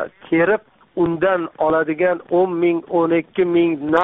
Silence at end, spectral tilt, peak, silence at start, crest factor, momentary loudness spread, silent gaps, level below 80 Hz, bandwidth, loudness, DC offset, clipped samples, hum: 0 s; -5.5 dB/octave; -2 dBFS; 0 s; 16 dB; 4 LU; none; -54 dBFS; 3.9 kHz; -18 LUFS; under 0.1%; under 0.1%; none